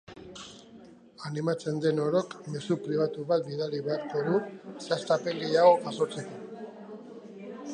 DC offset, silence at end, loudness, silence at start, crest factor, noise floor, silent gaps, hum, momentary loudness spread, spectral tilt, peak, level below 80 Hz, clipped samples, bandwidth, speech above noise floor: under 0.1%; 0 s; -28 LUFS; 0.1 s; 22 dB; -52 dBFS; none; none; 20 LU; -6 dB/octave; -8 dBFS; -72 dBFS; under 0.1%; 10 kHz; 24 dB